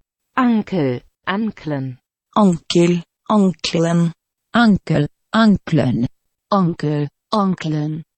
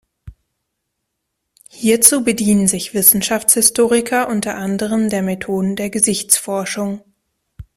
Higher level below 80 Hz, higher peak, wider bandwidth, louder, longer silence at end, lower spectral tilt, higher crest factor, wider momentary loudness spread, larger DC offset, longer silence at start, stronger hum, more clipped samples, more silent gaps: about the same, -48 dBFS vs -50 dBFS; about the same, -2 dBFS vs 0 dBFS; second, 8.8 kHz vs 16 kHz; second, -18 LUFS vs -14 LUFS; about the same, 0.15 s vs 0.15 s; first, -6.5 dB/octave vs -3 dB/octave; about the same, 16 dB vs 18 dB; about the same, 9 LU vs 11 LU; neither; about the same, 0.35 s vs 0.25 s; neither; neither; neither